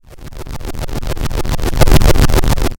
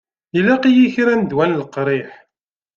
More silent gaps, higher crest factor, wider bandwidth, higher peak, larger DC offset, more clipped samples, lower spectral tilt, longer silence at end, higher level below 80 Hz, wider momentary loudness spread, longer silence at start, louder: neither; about the same, 12 dB vs 14 dB; first, 17.5 kHz vs 7 kHz; about the same, 0 dBFS vs -2 dBFS; neither; neither; second, -5.5 dB/octave vs -7.5 dB/octave; second, 0.05 s vs 0.65 s; first, -16 dBFS vs -58 dBFS; first, 18 LU vs 10 LU; second, 0.1 s vs 0.35 s; about the same, -16 LUFS vs -16 LUFS